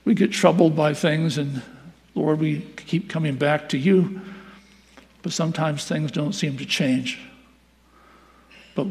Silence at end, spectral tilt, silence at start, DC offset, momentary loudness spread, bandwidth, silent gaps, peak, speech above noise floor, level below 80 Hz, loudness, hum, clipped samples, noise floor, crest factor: 0 s; -6 dB/octave; 0.05 s; under 0.1%; 15 LU; 14 kHz; none; -2 dBFS; 35 dB; -62 dBFS; -22 LUFS; none; under 0.1%; -56 dBFS; 22 dB